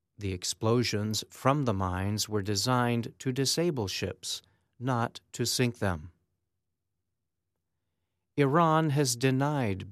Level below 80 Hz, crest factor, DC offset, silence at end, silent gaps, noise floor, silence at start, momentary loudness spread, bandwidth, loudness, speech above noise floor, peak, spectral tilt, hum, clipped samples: -62 dBFS; 20 dB; under 0.1%; 0 s; none; -86 dBFS; 0.2 s; 9 LU; 14.5 kHz; -29 LUFS; 57 dB; -10 dBFS; -4.5 dB/octave; none; under 0.1%